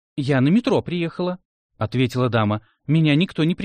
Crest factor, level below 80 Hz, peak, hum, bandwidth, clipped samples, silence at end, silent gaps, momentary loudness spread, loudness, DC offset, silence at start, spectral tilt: 14 dB; -56 dBFS; -8 dBFS; none; 9.6 kHz; under 0.1%; 0 s; 1.45-1.69 s; 10 LU; -21 LUFS; under 0.1%; 0.15 s; -7.5 dB/octave